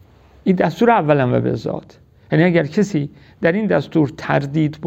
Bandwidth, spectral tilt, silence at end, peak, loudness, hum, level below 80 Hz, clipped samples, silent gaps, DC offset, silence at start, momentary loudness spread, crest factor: 8 kHz; -8 dB/octave; 0 s; -2 dBFS; -18 LUFS; none; -52 dBFS; under 0.1%; none; under 0.1%; 0.45 s; 9 LU; 16 dB